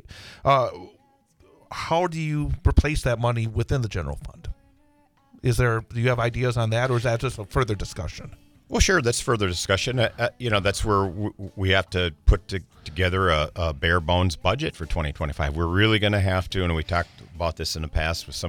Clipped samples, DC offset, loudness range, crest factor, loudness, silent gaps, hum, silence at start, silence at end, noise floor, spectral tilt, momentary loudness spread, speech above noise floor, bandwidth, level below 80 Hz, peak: under 0.1%; under 0.1%; 3 LU; 20 dB; -24 LUFS; none; none; 0.1 s; 0 s; -61 dBFS; -5 dB/octave; 12 LU; 37 dB; 18.5 kHz; -34 dBFS; -4 dBFS